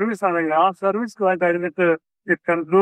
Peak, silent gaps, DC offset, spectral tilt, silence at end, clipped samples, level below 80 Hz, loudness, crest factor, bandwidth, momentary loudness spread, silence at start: -4 dBFS; none; under 0.1%; -7 dB/octave; 0 s; under 0.1%; -72 dBFS; -20 LUFS; 16 dB; 10.5 kHz; 5 LU; 0 s